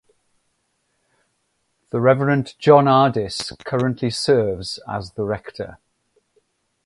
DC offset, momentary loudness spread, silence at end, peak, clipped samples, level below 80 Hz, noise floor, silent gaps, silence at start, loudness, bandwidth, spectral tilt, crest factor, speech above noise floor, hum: under 0.1%; 14 LU; 1.1 s; 0 dBFS; under 0.1%; -52 dBFS; -70 dBFS; none; 1.95 s; -19 LUFS; 11.5 kHz; -6 dB/octave; 20 dB; 51 dB; none